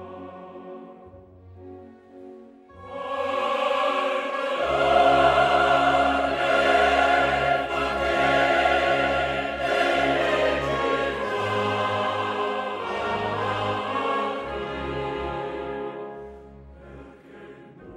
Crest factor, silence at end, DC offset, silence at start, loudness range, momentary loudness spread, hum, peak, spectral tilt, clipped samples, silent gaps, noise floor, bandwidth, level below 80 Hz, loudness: 18 dB; 0 s; under 0.1%; 0 s; 12 LU; 18 LU; none; -6 dBFS; -4.5 dB/octave; under 0.1%; none; -47 dBFS; 12.5 kHz; -46 dBFS; -23 LUFS